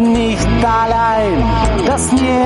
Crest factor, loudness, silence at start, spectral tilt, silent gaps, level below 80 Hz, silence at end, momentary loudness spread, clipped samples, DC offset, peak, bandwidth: 8 dB; -14 LUFS; 0 s; -5.5 dB/octave; none; -22 dBFS; 0 s; 1 LU; under 0.1%; under 0.1%; -4 dBFS; 11.5 kHz